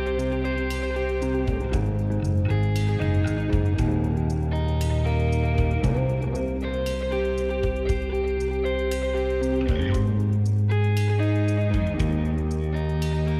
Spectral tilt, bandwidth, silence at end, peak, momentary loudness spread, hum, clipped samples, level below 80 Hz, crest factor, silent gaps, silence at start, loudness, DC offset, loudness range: -7.5 dB/octave; 13 kHz; 0 s; -8 dBFS; 4 LU; none; under 0.1%; -30 dBFS; 14 dB; none; 0 s; -24 LUFS; under 0.1%; 2 LU